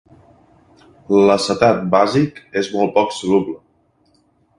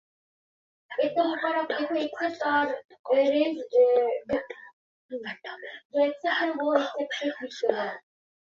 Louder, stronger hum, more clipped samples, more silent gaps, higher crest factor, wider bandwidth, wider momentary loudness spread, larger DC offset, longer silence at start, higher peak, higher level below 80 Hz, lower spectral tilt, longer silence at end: first, -16 LUFS vs -27 LUFS; neither; neither; second, none vs 2.85-2.89 s, 2.99-3.04 s, 4.73-5.09 s, 5.85-5.90 s; about the same, 18 dB vs 20 dB; first, 11.5 kHz vs 7.2 kHz; second, 9 LU vs 15 LU; neither; first, 1.1 s vs 0.9 s; first, 0 dBFS vs -6 dBFS; first, -54 dBFS vs -72 dBFS; first, -5.5 dB/octave vs -4 dB/octave; first, 1.05 s vs 0.5 s